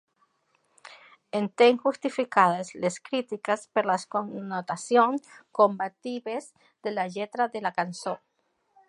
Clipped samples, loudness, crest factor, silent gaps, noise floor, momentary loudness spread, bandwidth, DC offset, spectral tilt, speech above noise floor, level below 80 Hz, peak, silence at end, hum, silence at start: under 0.1%; -27 LUFS; 22 dB; none; -74 dBFS; 13 LU; 11.5 kHz; under 0.1%; -4.5 dB/octave; 47 dB; -82 dBFS; -4 dBFS; 0.7 s; none; 1.35 s